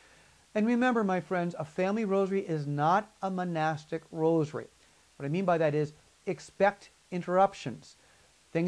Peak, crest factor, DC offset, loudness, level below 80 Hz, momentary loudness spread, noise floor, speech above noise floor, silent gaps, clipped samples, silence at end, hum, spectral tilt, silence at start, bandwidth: -12 dBFS; 18 dB; under 0.1%; -30 LUFS; -70 dBFS; 13 LU; -62 dBFS; 33 dB; none; under 0.1%; 0 s; none; -7 dB/octave; 0.55 s; 11 kHz